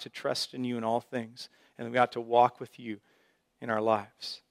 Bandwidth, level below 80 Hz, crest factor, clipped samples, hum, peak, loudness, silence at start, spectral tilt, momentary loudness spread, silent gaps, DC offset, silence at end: 15.5 kHz; -80 dBFS; 22 dB; under 0.1%; none; -8 dBFS; -30 LUFS; 0 s; -4.5 dB/octave; 18 LU; none; under 0.1%; 0.15 s